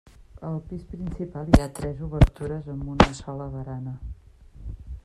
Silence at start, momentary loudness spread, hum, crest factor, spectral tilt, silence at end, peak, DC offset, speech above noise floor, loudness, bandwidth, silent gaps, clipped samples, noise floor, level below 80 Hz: 0.35 s; 20 LU; none; 24 dB; -7 dB/octave; 0.05 s; 0 dBFS; under 0.1%; 21 dB; -26 LUFS; 13.5 kHz; none; under 0.1%; -46 dBFS; -32 dBFS